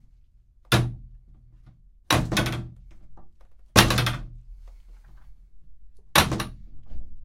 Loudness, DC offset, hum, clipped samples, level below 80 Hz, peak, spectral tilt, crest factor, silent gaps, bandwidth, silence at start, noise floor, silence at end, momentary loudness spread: -23 LUFS; under 0.1%; none; under 0.1%; -40 dBFS; 0 dBFS; -3.5 dB/octave; 28 dB; none; 16.5 kHz; 0.7 s; -56 dBFS; 0 s; 26 LU